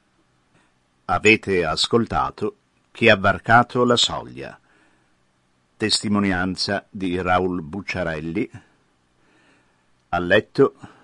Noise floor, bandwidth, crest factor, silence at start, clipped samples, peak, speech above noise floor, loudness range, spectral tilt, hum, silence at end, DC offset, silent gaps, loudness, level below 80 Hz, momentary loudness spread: -64 dBFS; 11.5 kHz; 22 dB; 1.1 s; under 0.1%; 0 dBFS; 44 dB; 7 LU; -4.5 dB/octave; none; 0.2 s; under 0.1%; none; -20 LUFS; -50 dBFS; 13 LU